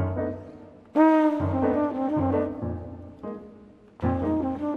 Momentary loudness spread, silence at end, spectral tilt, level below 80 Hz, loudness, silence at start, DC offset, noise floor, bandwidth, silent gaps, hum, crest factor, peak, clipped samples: 19 LU; 0 s; -10 dB/octave; -50 dBFS; -25 LUFS; 0 s; under 0.1%; -50 dBFS; 4.7 kHz; none; none; 18 dB; -6 dBFS; under 0.1%